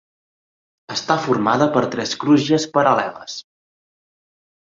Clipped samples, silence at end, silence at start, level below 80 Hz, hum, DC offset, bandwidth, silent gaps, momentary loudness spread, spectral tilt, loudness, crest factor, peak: under 0.1%; 1.25 s; 0.9 s; -62 dBFS; none; under 0.1%; 7.8 kHz; none; 13 LU; -5 dB/octave; -18 LUFS; 18 dB; -2 dBFS